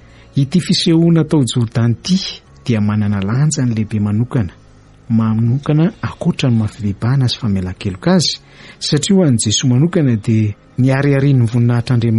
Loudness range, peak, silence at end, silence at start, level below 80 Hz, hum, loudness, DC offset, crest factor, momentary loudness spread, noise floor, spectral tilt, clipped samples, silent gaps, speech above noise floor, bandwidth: 3 LU; -2 dBFS; 0 s; 0.35 s; -44 dBFS; none; -15 LUFS; under 0.1%; 12 dB; 7 LU; -43 dBFS; -6 dB/octave; under 0.1%; none; 29 dB; 11.5 kHz